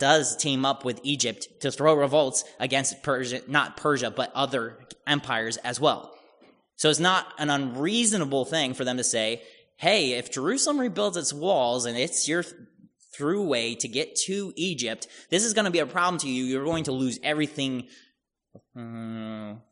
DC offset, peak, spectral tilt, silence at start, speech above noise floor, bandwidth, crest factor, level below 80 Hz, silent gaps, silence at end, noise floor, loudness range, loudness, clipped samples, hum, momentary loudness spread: under 0.1%; -6 dBFS; -3 dB/octave; 0 s; 43 dB; 11 kHz; 22 dB; -68 dBFS; none; 0.1 s; -69 dBFS; 3 LU; -25 LUFS; under 0.1%; none; 9 LU